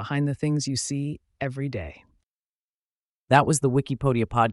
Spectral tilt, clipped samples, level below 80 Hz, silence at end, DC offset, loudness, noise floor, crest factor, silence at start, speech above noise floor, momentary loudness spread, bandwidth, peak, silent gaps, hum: -5.5 dB/octave; under 0.1%; -50 dBFS; 0 s; under 0.1%; -25 LUFS; under -90 dBFS; 20 dB; 0 s; over 66 dB; 12 LU; 11.5 kHz; -4 dBFS; 2.23-3.27 s; none